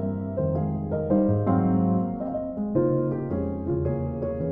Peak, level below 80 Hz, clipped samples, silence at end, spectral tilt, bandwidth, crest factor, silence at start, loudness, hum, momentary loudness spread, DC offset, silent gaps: -10 dBFS; -44 dBFS; under 0.1%; 0 s; -14 dB/octave; 2.9 kHz; 16 dB; 0 s; -26 LUFS; none; 7 LU; under 0.1%; none